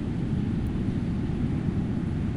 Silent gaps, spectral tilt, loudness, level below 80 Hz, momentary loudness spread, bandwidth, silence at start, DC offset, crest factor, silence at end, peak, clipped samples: none; -9 dB/octave; -28 LUFS; -38 dBFS; 1 LU; 11 kHz; 0 s; under 0.1%; 14 dB; 0 s; -14 dBFS; under 0.1%